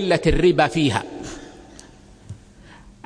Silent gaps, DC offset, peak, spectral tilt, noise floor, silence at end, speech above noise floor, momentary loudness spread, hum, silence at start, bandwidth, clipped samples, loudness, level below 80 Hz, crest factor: none; under 0.1%; -2 dBFS; -5.5 dB/octave; -46 dBFS; 0.15 s; 28 dB; 25 LU; none; 0 s; 10.5 kHz; under 0.1%; -19 LUFS; -34 dBFS; 20 dB